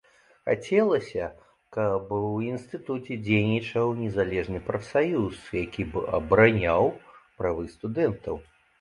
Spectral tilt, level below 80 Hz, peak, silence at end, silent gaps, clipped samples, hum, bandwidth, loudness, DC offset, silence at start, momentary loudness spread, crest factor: -7.5 dB/octave; -50 dBFS; -4 dBFS; 0.4 s; none; under 0.1%; none; 11 kHz; -26 LUFS; under 0.1%; 0.45 s; 11 LU; 24 dB